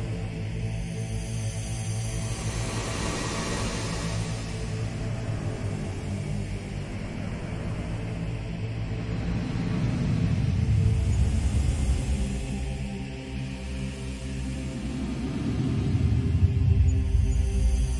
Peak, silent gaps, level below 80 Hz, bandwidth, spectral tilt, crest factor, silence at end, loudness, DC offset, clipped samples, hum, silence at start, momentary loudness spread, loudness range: -10 dBFS; none; -32 dBFS; 11.5 kHz; -6 dB/octave; 18 dB; 0 s; -29 LUFS; under 0.1%; under 0.1%; none; 0 s; 10 LU; 6 LU